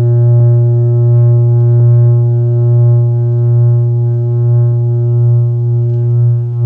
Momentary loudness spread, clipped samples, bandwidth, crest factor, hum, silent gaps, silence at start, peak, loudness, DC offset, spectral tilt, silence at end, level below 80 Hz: 4 LU; under 0.1%; 1.5 kHz; 8 dB; none; none; 0 s; -2 dBFS; -10 LUFS; under 0.1%; -13.5 dB/octave; 0 s; -52 dBFS